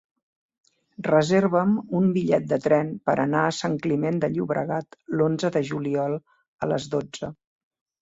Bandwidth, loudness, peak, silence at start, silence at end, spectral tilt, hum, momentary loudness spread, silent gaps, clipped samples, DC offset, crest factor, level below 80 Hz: 8 kHz; -24 LUFS; -6 dBFS; 1 s; 0.7 s; -6.5 dB/octave; none; 10 LU; 6.48-6.59 s; under 0.1%; under 0.1%; 18 dB; -62 dBFS